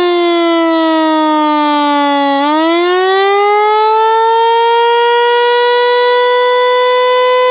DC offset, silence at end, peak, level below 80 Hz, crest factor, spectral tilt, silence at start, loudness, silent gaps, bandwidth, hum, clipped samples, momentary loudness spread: under 0.1%; 0 s; 0 dBFS; -66 dBFS; 10 dB; -5.5 dB/octave; 0 s; -10 LUFS; none; 4 kHz; none; under 0.1%; 2 LU